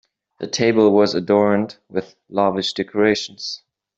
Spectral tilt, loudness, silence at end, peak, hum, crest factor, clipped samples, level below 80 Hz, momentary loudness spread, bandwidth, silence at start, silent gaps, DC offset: -5 dB/octave; -19 LUFS; 0.4 s; -2 dBFS; none; 16 dB; under 0.1%; -62 dBFS; 14 LU; 8 kHz; 0.4 s; none; under 0.1%